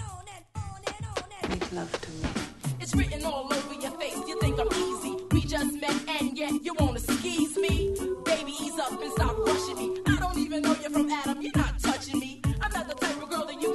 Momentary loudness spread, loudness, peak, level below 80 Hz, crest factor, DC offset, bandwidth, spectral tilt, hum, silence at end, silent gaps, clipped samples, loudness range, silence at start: 8 LU; -29 LUFS; -10 dBFS; -40 dBFS; 20 dB; under 0.1%; 12 kHz; -5 dB/octave; none; 0 s; none; under 0.1%; 4 LU; 0 s